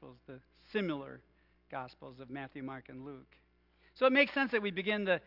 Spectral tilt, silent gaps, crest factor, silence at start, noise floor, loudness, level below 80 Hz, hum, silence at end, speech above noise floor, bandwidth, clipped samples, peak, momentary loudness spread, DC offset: -7.5 dB/octave; none; 22 dB; 0 s; -69 dBFS; -33 LUFS; -70 dBFS; none; 0.05 s; 34 dB; 5.8 kHz; under 0.1%; -14 dBFS; 24 LU; under 0.1%